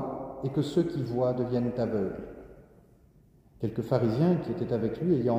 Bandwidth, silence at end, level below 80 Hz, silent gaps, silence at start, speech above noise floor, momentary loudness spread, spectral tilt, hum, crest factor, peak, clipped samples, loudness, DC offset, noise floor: 13 kHz; 0 s; -56 dBFS; none; 0 s; 32 dB; 10 LU; -9 dB/octave; none; 18 dB; -10 dBFS; under 0.1%; -29 LUFS; under 0.1%; -59 dBFS